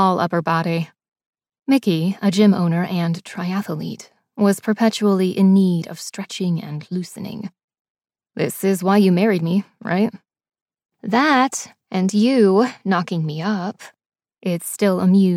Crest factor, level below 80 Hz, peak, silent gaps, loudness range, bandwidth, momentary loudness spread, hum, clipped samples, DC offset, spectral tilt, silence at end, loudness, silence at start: 16 dB; -70 dBFS; -2 dBFS; 1.08-1.12 s, 1.26-1.33 s, 7.64-7.68 s, 7.79-7.95 s, 10.62-10.66 s, 10.85-10.89 s, 14.06-14.10 s; 2 LU; 15.5 kHz; 15 LU; none; under 0.1%; under 0.1%; -6 dB/octave; 0 s; -19 LUFS; 0 s